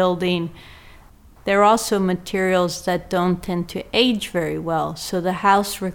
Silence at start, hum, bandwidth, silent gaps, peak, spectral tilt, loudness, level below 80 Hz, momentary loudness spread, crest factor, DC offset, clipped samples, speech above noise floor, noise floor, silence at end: 0 s; none; 18 kHz; none; -4 dBFS; -5 dB/octave; -20 LUFS; -46 dBFS; 8 LU; 18 dB; under 0.1%; under 0.1%; 27 dB; -47 dBFS; 0 s